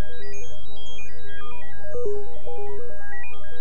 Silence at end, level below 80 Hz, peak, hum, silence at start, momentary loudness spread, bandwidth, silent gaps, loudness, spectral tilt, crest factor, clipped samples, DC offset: 0 s; -48 dBFS; -8 dBFS; 50 Hz at -55 dBFS; 0 s; 10 LU; 8.8 kHz; none; -37 LUFS; -5.5 dB/octave; 16 dB; under 0.1%; 30%